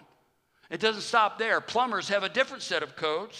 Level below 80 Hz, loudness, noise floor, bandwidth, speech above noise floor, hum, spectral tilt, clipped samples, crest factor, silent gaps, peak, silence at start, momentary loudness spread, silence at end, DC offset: -80 dBFS; -27 LUFS; -69 dBFS; 12.5 kHz; 41 dB; none; -2.5 dB/octave; under 0.1%; 22 dB; none; -8 dBFS; 0.7 s; 6 LU; 0 s; under 0.1%